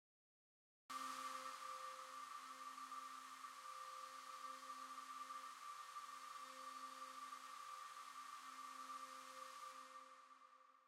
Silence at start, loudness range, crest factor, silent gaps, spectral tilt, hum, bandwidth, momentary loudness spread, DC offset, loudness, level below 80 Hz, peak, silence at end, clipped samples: 0.9 s; 2 LU; 16 dB; none; 0.5 dB/octave; none; 16 kHz; 5 LU; under 0.1%; -54 LUFS; under -90 dBFS; -38 dBFS; 0 s; under 0.1%